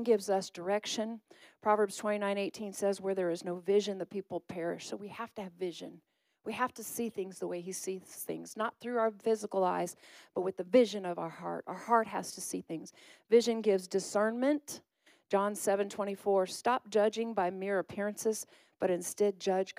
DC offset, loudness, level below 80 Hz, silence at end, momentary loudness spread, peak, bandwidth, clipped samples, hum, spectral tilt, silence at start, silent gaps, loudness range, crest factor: under 0.1%; -34 LUFS; -82 dBFS; 0.05 s; 12 LU; -14 dBFS; 15.5 kHz; under 0.1%; none; -4 dB/octave; 0 s; none; 7 LU; 20 dB